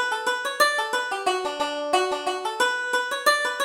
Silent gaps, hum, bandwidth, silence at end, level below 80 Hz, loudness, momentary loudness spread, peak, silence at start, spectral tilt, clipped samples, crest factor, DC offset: none; none; 17.5 kHz; 0 s; -68 dBFS; -24 LUFS; 6 LU; -6 dBFS; 0 s; 0 dB/octave; under 0.1%; 18 dB; under 0.1%